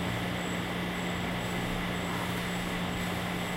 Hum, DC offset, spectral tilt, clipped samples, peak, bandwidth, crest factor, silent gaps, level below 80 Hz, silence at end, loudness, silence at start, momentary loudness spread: none; under 0.1%; -5 dB/octave; under 0.1%; -20 dBFS; 16 kHz; 12 dB; none; -48 dBFS; 0 s; -32 LUFS; 0 s; 0 LU